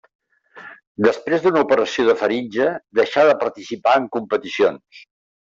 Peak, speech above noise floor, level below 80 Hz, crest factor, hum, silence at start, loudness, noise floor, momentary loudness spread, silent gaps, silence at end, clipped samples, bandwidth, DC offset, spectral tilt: -2 dBFS; 25 dB; -64 dBFS; 16 dB; none; 0.55 s; -19 LUFS; -43 dBFS; 9 LU; 0.87-0.95 s; 0.4 s; under 0.1%; 7.6 kHz; under 0.1%; -5 dB/octave